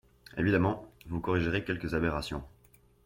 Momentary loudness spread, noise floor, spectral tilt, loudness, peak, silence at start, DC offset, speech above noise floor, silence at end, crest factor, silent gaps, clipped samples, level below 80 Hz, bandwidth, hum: 13 LU; -62 dBFS; -7 dB/octave; -32 LUFS; -12 dBFS; 0.35 s; under 0.1%; 32 dB; 0.55 s; 20 dB; none; under 0.1%; -50 dBFS; 16.5 kHz; none